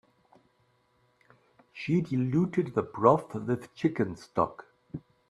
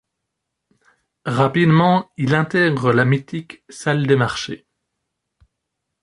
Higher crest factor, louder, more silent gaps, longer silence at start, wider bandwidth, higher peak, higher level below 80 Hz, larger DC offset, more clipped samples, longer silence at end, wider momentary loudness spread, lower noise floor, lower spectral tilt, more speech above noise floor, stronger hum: about the same, 24 dB vs 20 dB; second, -29 LUFS vs -17 LUFS; neither; first, 1.75 s vs 1.25 s; about the same, 11.5 kHz vs 11.5 kHz; second, -6 dBFS vs 0 dBFS; second, -64 dBFS vs -56 dBFS; neither; neither; second, 0.3 s vs 1.45 s; first, 19 LU vs 16 LU; second, -69 dBFS vs -78 dBFS; first, -8.5 dB/octave vs -6.5 dB/octave; second, 42 dB vs 61 dB; neither